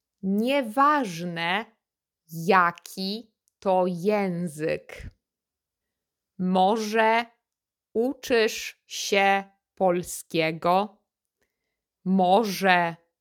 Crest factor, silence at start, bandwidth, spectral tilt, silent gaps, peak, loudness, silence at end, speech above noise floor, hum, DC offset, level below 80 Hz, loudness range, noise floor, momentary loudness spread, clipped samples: 22 dB; 0.25 s; 19 kHz; -5 dB/octave; none; -4 dBFS; -24 LUFS; 0.25 s; 65 dB; none; under 0.1%; -62 dBFS; 3 LU; -89 dBFS; 12 LU; under 0.1%